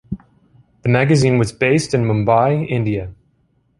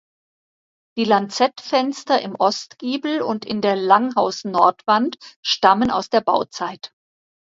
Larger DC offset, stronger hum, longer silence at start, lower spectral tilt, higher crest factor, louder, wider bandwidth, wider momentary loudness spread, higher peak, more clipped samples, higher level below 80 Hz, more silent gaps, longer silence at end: neither; neither; second, 0.1 s vs 0.95 s; first, -6.5 dB/octave vs -4 dB/octave; about the same, 16 dB vs 20 dB; first, -16 LUFS vs -19 LUFS; first, 11.5 kHz vs 7.8 kHz; about the same, 13 LU vs 11 LU; about the same, -2 dBFS vs 0 dBFS; neither; first, -44 dBFS vs -60 dBFS; second, none vs 5.36-5.43 s; about the same, 0.65 s vs 0.7 s